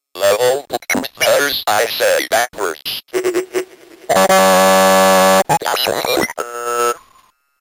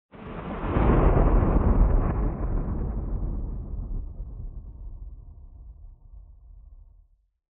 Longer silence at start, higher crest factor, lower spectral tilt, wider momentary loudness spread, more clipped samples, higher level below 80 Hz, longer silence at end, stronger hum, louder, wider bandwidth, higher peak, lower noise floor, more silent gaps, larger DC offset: about the same, 0.15 s vs 0.15 s; second, 12 dB vs 18 dB; second, -2.5 dB/octave vs -9.5 dB/octave; second, 11 LU vs 24 LU; neither; second, -54 dBFS vs -28 dBFS; about the same, 0.65 s vs 0.7 s; neither; first, -14 LUFS vs -26 LUFS; first, 17.5 kHz vs 3.5 kHz; first, -4 dBFS vs -8 dBFS; second, -53 dBFS vs -59 dBFS; neither; neither